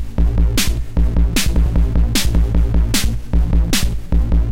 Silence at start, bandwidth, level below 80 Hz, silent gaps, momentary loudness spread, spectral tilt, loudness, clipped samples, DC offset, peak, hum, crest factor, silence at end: 0 s; 16.5 kHz; -16 dBFS; none; 3 LU; -4.5 dB/octave; -18 LUFS; under 0.1%; under 0.1%; -4 dBFS; none; 10 dB; 0 s